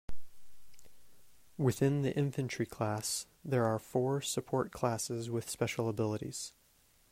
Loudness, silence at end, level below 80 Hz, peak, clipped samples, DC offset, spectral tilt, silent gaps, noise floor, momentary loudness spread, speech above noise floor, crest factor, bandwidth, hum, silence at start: -35 LUFS; 0.6 s; -60 dBFS; -16 dBFS; under 0.1%; under 0.1%; -5.5 dB/octave; none; -68 dBFS; 7 LU; 34 dB; 18 dB; 16 kHz; none; 0.1 s